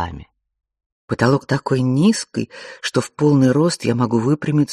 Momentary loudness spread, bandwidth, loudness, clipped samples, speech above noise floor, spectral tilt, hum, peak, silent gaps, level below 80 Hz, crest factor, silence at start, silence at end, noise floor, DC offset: 13 LU; 12.5 kHz; -18 LUFS; under 0.1%; 21 dB; -6 dB/octave; none; -2 dBFS; 0.86-1.08 s; -50 dBFS; 16 dB; 0 s; 0 s; -38 dBFS; under 0.1%